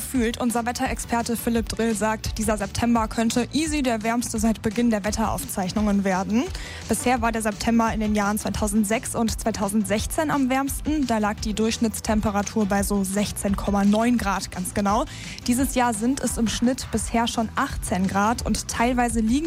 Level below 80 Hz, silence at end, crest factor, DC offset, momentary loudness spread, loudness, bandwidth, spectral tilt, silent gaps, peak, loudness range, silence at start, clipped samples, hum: -36 dBFS; 0 s; 12 dB; under 0.1%; 4 LU; -23 LUFS; 16 kHz; -4.5 dB/octave; none; -10 dBFS; 1 LU; 0 s; under 0.1%; none